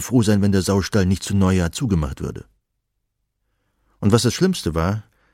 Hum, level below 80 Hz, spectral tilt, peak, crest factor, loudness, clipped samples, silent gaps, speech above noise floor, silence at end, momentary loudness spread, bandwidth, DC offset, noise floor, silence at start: none; -38 dBFS; -6 dB/octave; -2 dBFS; 18 dB; -20 LUFS; under 0.1%; none; 56 dB; 0.35 s; 11 LU; 16 kHz; under 0.1%; -75 dBFS; 0 s